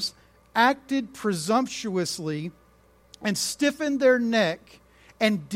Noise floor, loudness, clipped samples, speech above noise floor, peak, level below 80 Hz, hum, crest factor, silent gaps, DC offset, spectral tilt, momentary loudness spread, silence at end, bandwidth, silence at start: -58 dBFS; -25 LUFS; under 0.1%; 34 dB; -6 dBFS; -62 dBFS; none; 20 dB; none; under 0.1%; -4 dB/octave; 11 LU; 0 s; 16.5 kHz; 0 s